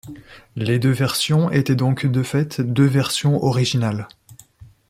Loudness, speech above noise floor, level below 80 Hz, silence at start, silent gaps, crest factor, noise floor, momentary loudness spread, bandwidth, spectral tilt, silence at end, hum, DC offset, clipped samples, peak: -19 LUFS; 28 dB; -54 dBFS; 0.05 s; none; 16 dB; -46 dBFS; 10 LU; 15.5 kHz; -6 dB/octave; 0.25 s; none; under 0.1%; under 0.1%; -4 dBFS